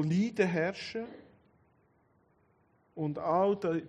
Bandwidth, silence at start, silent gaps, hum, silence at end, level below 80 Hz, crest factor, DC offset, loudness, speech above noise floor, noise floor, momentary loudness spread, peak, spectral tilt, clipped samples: 9.6 kHz; 0 s; none; none; 0 s; -72 dBFS; 20 dB; under 0.1%; -32 LUFS; 38 dB; -69 dBFS; 13 LU; -14 dBFS; -7 dB/octave; under 0.1%